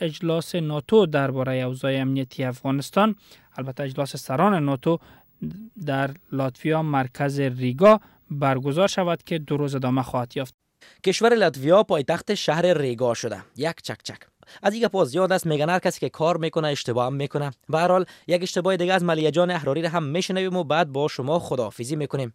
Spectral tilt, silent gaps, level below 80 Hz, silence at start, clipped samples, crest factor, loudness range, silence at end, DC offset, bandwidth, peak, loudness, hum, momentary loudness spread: -6 dB/octave; 10.54-10.58 s; -62 dBFS; 0 s; under 0.1%; 18 dB; 3 LU; 0.05 s; under 0.1%; 16.5 kHz; -6 dBFS; -23 LUFS; none; 10 LU